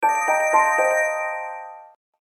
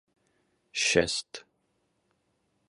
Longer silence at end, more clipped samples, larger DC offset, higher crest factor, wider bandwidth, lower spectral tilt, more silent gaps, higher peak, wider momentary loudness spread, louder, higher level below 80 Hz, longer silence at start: second, 0.4 s vs 1.3 s; neither; neither; second, 16 dB vs 26 dB; first, 16 kHz vs 11.5 kHz; about the same, -1.5 dB/octave vs -2 dB/octave; neither; first, -4 dBFS vs -8 dBFS; second, 17 LU vs 21 LU; first, -20 LUFS vs -27 LUFS; second, under -90 dBFS vs -60 dBFS; second, 0 s vs 0.75 s